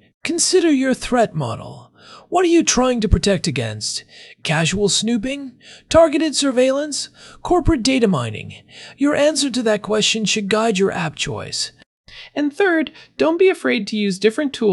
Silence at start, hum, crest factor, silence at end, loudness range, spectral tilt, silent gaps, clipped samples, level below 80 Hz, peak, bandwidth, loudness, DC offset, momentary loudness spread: 0.25 s; none; 16 dB; 0 s; 2 LU; -4 dB/octave; 11.86-12.04 s; under 0.1%; -36 dBFS; -2 dBFS; 12 kHz; -18 LUFS; under 0.1%; 13 LU